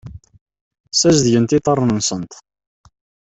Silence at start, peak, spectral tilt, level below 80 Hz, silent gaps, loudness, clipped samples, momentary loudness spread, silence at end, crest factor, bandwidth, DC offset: 0.05 s; -2 dBFS; -4.5 dB/octave; -48 dBFS; 0.41-0.46 s, 0.61-0.71 s, 0.80-0.84 s; -15 LUFS; under 0.1%; 11 LU; 1 s; 18 dB; 8.4 kHz; under 0.1%